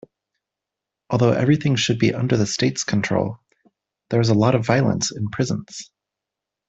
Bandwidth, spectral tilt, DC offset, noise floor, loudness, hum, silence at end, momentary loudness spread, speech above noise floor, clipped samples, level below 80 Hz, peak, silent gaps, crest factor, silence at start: 8.2 kHz; -5.5 dB/octave; under 0.1%; -85 dBFS; -20 LUFS; none; 0.85 s; 10 LU; 66 dB; under 0.1%; -54 dBFS; -2 dBFS; none; 20 dB; 1.1 s